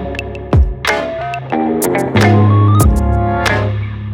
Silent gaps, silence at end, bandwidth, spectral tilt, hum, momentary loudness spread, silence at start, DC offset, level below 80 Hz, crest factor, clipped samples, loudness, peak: none; 0 s; 17 kHz; -6.5 dB/octave; none; 11 LU; 0 s; under 0.1%; -20 dBFS; 12 dB; under 0.1%; -14 LUFS; 0 dBFS